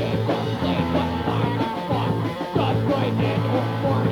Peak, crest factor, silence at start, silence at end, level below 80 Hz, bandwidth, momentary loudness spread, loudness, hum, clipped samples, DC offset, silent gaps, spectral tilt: -8 dBFS; 14 dB; 0 s; 0 s; -44 dBFS; 16 kHz; 3 LU; -23 LUFS; none; under 0.1%; under 0.1%; none; -7.5 dB/octave